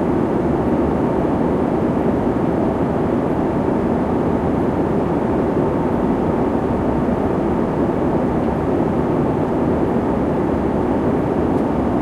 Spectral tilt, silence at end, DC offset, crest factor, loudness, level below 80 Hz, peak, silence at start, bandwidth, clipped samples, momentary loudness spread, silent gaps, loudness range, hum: -9.5 dB/octave; 0 s; under 0.1%; 12 dB; -18 LUFS; -34 dBFS; -6 dBFS; 0 s; 11.5 kHz; under 0.1%; 1 LU; none; 0 LU; none